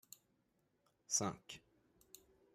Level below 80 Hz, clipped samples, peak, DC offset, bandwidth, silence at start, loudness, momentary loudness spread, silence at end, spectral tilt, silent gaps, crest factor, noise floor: -80 dBFS; under 0.1%; -24 dBFS; under 0.1%; 16 kHz; 1.1 s; -40 LUFS; 24 LU; 0.95 s; -2.5 dB/octave; none; 24 dB; -81 dBFS